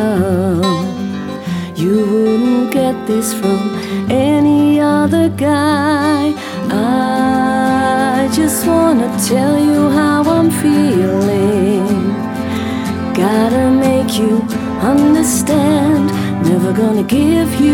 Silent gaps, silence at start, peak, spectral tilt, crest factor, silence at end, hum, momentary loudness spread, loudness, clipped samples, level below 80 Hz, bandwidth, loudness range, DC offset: none; 0 s; -2 dBFS; -5.5 dB/octave; 12 dB; 0 s; none; 7 LU; -13 LUFS; under 0.1%; -42 dBFS; 18 kHz; 2 LU; under 0.1%